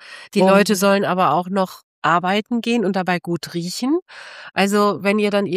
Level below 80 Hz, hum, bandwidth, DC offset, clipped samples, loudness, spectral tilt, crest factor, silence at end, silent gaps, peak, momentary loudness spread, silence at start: -70 dBFS; none; 15.5 kHz; under 0.1%; under 0.1%; -19 LUFS; -5 dB/octave; 16 dB; 0 s; 1.83-2.02 s, 4.02-4.06 s; -2 dBFS; 11 LU; 0 s